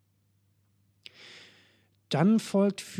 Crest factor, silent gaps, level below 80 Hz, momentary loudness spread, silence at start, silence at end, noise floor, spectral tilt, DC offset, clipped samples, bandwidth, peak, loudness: 20 dB; none; -82 dBFS; 25 LU; 2.1 s; 0 s; -70 dBFS; -6.5 dB/octave; under 0.1%; under 0.1%; 14 kHz; -12 dBFS; -26 LUFS